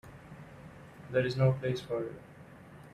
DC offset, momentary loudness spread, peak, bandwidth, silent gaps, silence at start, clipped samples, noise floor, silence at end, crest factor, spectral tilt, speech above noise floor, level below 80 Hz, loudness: under 0.1%; 24 LU; -16 dBFS; 10 kHz; none; 0.05 s; under 0.1%; -52 dBFS; 0.05 s; 18 dB; -7.5 dB/octave; 21 dB; -62 dBFS; -32 LUFS